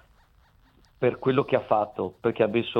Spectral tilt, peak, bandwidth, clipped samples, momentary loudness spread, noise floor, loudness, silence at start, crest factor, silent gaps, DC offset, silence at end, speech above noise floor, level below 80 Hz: -8.5 dB/octave; -6 dBFS; 5.6 kHz; under 0.1%; 5 LU; -60 dBFS; -26 LUFS; 1 s; 20 dB; none; under 0.1%; 0 s; 35 dB; -62 dBFS